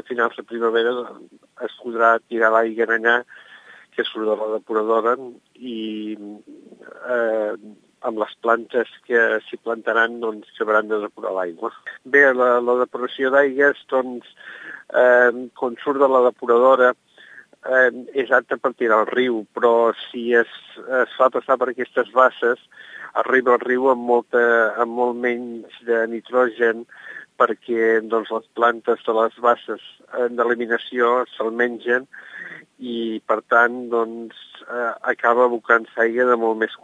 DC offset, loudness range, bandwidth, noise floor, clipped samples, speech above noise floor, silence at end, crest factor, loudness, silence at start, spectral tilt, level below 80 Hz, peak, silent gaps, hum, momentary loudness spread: under 0.1%; 5 LU; 7.8 kHz; -46 dBFS; under 0.1%; 27 dB; 0.05 s; 20 dB; -19 LUFS; 0.1 s; -5 dB/octave; -82 dBFS; 0 dBFS; none; none; 16 LU